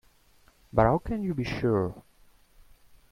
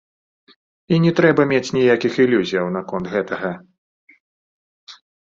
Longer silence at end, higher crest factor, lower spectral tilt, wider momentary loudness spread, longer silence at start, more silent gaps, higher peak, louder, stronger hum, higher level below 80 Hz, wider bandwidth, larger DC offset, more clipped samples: first, 1.1 s vs 0.3 s; about the same, 22 dB vs 18 dB; first, -8.5 dB/octave vs -6.5 dB/octave; about the same, 9 LU vs 11 LU; second, 0.75 s vs 0.9 s; second, none vs 3.78-4.07 s, 4.20-4.87 s; second, -8 dBFS vs -2 dBFS; second, -27 LUFS vs -18 LUFS; neither; first, -46 dBFS vs -58 dBFS; first, 14.5 kHz vs 7.6 kHz; neither; neither